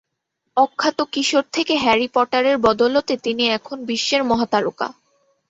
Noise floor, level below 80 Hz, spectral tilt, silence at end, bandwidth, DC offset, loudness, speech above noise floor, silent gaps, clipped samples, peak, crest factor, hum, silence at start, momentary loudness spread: -76 dBFS; -56 dBFS; -3 dB/octave; 0.6 s; 8.4 kHz; under 0.1%; -19 LUFS; 57 dB; none; under 0.1%; -2 dBFS; 18 dB; none; 0.55 s; 8 LU